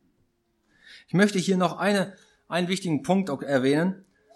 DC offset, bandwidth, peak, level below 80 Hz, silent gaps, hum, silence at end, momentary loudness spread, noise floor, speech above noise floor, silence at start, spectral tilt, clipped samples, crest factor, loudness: under 0.1%; 12.5 kHz; -6 dBFS; -70 dBFS; none; none; 0.4 s; 7 LU; -70 dBFS; 46 dB; 0.9 s; -5.5 dB/octave; under 0.1%; 20 dB; -25 LUFS